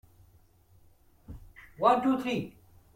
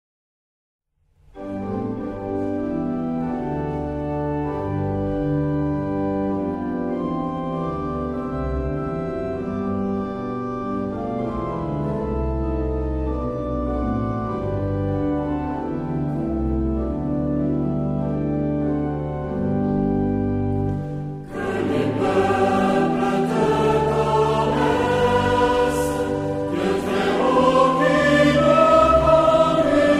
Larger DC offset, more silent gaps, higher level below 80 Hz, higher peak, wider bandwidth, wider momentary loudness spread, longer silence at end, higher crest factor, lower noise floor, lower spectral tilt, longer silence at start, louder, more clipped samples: neither; neither; second, -58 dBFS vs -36 dBFS; second, -10 dBFS vs -4 dBFS; first, 16 kHz vs 14 kHz; first, 26 LU vs 10 LU; first, 0.45 s vs 0 s; about the same, 22 dB vs 18 dB; first, -61 dBFS vs -57 dBFS; about the same, -6.5 dB/octave vs -7 dB/octave; about the same, 1.3 s vs 1.35 s; second, -28 LUFS vs -22 LUFS; neither